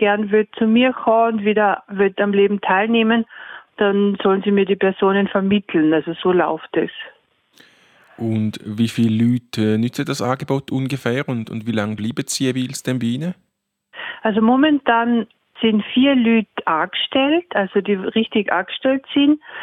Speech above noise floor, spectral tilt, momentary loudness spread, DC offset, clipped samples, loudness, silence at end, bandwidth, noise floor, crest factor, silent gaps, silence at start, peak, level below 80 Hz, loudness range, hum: 44 dB; -5.5 dB/octave; 8 LU; under 0.1%; under 0.1%; -18 LUFS; 0 s; 15 kHz; -62 dBFS; 16 dB; none; 0 s; -2 dBFS; -64 dBFS; 5 LU; none